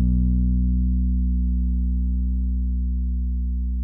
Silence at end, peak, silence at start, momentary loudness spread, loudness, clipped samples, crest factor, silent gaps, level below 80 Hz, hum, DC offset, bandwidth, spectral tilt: 0 s; -10 dBFS; 0 s; 5 LU; -24 LUFS; under 0.1%; 10 dB; none; -22 dBFS; 60 Hz at -60 dBFS; under 0.1%; 0.6 kHz; -15 dB/octave